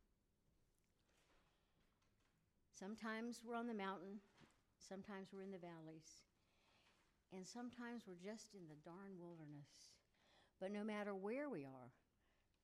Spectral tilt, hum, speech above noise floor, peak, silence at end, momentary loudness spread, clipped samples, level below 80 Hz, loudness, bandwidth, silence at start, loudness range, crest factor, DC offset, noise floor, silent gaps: -5 dB/octave; none; 30 dB; -36 dBFS; 0.75 s; 15 LU; under 0.1%; -88 dBFS; -53 LUFS; 13 kHz; 1.35 s; 6 LU; 18 dB; under 0.1%; -83 dBFS; none